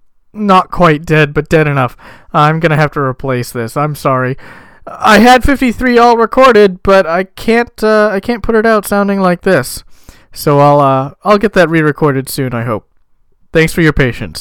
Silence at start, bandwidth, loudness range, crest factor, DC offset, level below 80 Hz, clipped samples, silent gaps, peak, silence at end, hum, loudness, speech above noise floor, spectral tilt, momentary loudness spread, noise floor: 0.35 s; 18.5 kHz; 4 LU; 10 dB; under 0.1%; -30 dBFS; under 0.1%; none; 0 dBFS; 0 s; none; -10 LUFS; 39 dB; -6 dB/octave; 10 LU; -49 dBFS